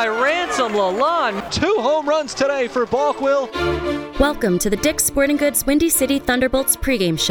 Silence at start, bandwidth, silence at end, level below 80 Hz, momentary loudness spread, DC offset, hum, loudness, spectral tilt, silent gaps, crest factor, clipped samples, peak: 0 s; over 20 kHz; 0 s; -36 dBFS; 4 LU; under 0.1%; none; -18 LUFS; -3.5 dB/octave; none; 18 dB; under 0.1%; 0 dBFS